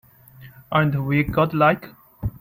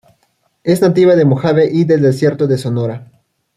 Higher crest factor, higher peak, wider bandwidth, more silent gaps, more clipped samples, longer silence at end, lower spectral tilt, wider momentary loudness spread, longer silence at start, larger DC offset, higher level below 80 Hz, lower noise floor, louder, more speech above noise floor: first, 18 dB vs 12 dB; about the same, -4 dBFS vs -2 dBFS; first, 16 kHz vs 14 kHz; neither; neither; second, 0.1 s vs 0.5 s; about the same, -9 dB/octave vs -8 dB/octave; about the same, 13 LU vs 11 LU; second, 0.4 s vs 0.65 s; neither; first, -42 dBFS vs -54 dBFS; second, -46 dBFS vs -61 dBFS; second, -20 LUFS vs -13 LUFS; second, 27 dB vs 49 dB